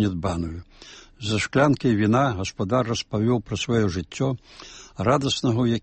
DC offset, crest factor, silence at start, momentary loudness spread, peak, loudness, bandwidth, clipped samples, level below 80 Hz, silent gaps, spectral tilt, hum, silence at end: under 0.1%; 18 dB; 0 s; 18 LU; -6 dBFS; -23 LUFS; 8.8 kHz; under 0.1%; -48 dBFS; none; -6 dB/octave; none; 0.05 s